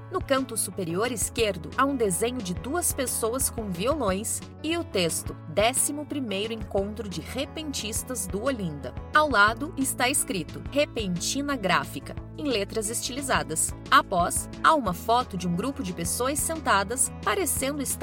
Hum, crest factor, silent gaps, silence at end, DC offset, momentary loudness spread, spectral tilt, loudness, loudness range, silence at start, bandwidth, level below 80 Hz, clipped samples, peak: none; 20 dB; none; 0 s; under 0.1%; 9 LU; -3 dB/octave; -26 LUFS; 3 LU; 0 s; 17 kHz; -44 dBFS; under 0.1%; -6 dBFS